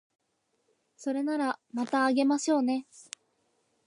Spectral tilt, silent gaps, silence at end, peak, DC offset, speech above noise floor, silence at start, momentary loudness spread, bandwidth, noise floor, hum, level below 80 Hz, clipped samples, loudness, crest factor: -3 dB/octave; none; 0.85 s; -14 dBFS; under 0.1%; 47 dB; 1 s; 21 LU; 11 kHz; -76 dBFS; none; -86 dBFS; under 0.1%; -29 LUFS; 16 dB